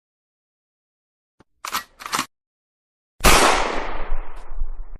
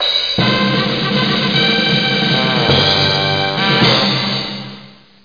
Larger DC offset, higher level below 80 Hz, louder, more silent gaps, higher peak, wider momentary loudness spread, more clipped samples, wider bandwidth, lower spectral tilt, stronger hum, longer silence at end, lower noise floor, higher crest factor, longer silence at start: second, under 0.1% vs 0.4%; first, -30 dBFS vs -44 dBFS; second, -20 LUFS vs -13 LUFS; first, 2.47-3.19 s vs none; about the same, 0 dBFS vs 0 dBFS; first, 22 LU vs 6 LU; neither; first, 16 kHz vs 5.2 kHz; second, -2.5 dB/octave vs -5 dB/octave; neither; second, 0.05 s vs 0.35 s; first, under -90 dBFS vs -39 dBFS; first, 22 dB vs 14 dB; first, 1.65 s vs 0 s